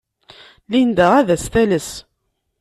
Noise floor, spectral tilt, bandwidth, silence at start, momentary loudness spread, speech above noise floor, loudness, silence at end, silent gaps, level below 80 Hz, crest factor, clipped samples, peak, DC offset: -71 dBFS; -5.5 dB/octave; 13 kHz; 0.7 s; 13 LU; 56 dB; -16 LUFS; 0.6 s; none; -44 dBFS; 16 dB; under 0.1%; -2 dBFS; under 0.1%